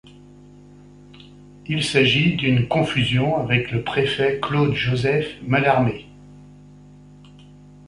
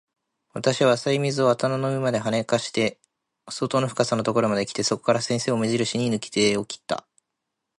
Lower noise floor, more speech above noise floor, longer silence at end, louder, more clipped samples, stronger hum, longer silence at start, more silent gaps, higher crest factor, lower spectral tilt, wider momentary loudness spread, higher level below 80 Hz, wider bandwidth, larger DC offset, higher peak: second, -45 dBFS vs -82 dBFS; second, 26 dB vs 58 dB; second, 0.45 s vs 0.8 s; first, -20 LUFS vs -23 LUFS; neither; first, 50 Hz at -40 dBFS vs none; second, 0.05 s vs 0.55 s; neither; about the same, 18 dB vs 18 dB; first, -6 dB/octave vs -4.5 dB/octave; about the same, 7 LU vs 8 LU; first, -48 dBFS vs -64 dBFS; about the same, 11.5 kHz vs 11.5 kHz; neither; about the same, -4 dBFS vs -6 dBFS